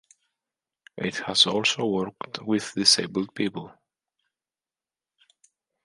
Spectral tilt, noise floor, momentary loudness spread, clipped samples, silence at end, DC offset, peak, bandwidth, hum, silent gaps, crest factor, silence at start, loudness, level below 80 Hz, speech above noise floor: -2.5 dB/octave; under -90 dBFS; 14 LU; under 0.1%; 2.15 s; under 0.1%; -4 dBFS; 11.5 kHz; none; none; 26 dB; 0.95 s; -23 LUFS; -68 dBFS; over 65 dB